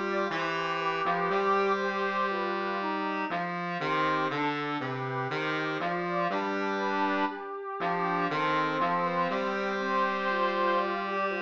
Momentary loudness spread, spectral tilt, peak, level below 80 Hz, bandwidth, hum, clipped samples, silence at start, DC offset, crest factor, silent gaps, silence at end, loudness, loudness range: 5 LU; -6 dB/octave; -16 dBFS; -76 dBFS; 7.6 kHz; none; under 0.1%; 0 s; under 0.1%; 14 dB; none; 0 s; -29 LUFS; 2 LU